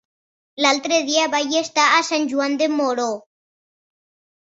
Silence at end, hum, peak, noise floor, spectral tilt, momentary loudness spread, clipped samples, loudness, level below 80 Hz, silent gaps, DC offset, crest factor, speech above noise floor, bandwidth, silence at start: 1.25 s; none; -4 dBFS; under -90 dBFS; -1 dB/octave; 7 LU; under 0.1%; -19 LUFS; -72 dBFS; none; under 0.1%; 18 dB; over 71 dB; 8.2 kHz; 0.55 s